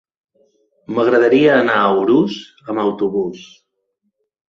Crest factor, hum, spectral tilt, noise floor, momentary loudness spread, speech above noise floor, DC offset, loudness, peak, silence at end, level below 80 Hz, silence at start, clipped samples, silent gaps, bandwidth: 16 dB; none; -6.5 dB/octave; -71 dBFS; 13 LU; 56 dB; under 0.1%; -15 LUFS; -2 dBFS; 1.05 s; -60 dBFS; 0.9 s; under 0.1%; none; 7.4 kHz